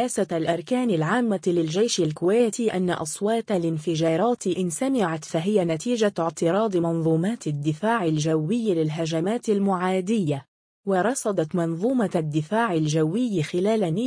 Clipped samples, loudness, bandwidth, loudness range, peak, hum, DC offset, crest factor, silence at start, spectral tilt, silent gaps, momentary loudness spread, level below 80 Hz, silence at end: under 0.1%; -24 LUFS; 10.5 kHz; 1 LU; -8 dBFS; none; under 0.1%; 14 dB; 0 s; -6 dB/octave; 10.48-10.83 s; 4 LU; -66 dBFS; 0 s